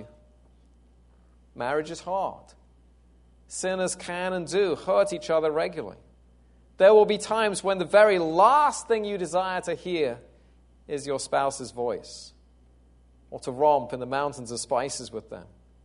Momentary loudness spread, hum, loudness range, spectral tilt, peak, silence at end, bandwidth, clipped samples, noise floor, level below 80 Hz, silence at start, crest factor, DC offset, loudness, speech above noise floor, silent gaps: 18 LU; none; 11 LU; -4 dB/octave; -6 dBFS; 0.4 s; 11 kHz; under 0.1%; -57 dBFS; -58 dBFS; 0 s; 20 dB; under 0.1%; -25 LUFS; 32 dB; none